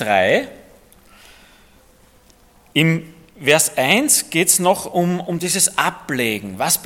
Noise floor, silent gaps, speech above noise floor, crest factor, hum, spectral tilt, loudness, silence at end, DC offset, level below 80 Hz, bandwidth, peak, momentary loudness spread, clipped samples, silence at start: -51 dBFS; none; 33 dB; 20 dB; none; -3 dB/octave; -17 LUFS; 0 s; under 0.1%; -56 dBFS; 17.5 kHz; 0 dBFS; 8 LU; under 0.1%; 0 s